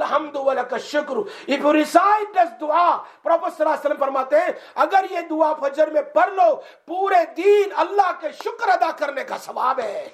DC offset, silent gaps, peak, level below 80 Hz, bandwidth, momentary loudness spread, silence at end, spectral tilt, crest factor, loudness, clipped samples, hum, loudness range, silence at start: under 0.1%; none; 0 dBFS; -78 dBFS; 15 kHz; 9 LU; 0.05 s; -3 dB/octave; 20 dB; -20 LUFS; under 0.1%; none; 1 LU; 0 s